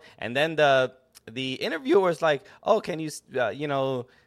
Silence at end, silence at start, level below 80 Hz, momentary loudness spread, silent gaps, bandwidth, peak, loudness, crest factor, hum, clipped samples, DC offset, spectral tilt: 0.25 s; 0.2 s; -68 dBFS; 11 LU; none; 14.5 kHz; -8 dBFS; -25 LUFS; 18 dB; none; under 0.1%; under 0.1%; -5 dB/octave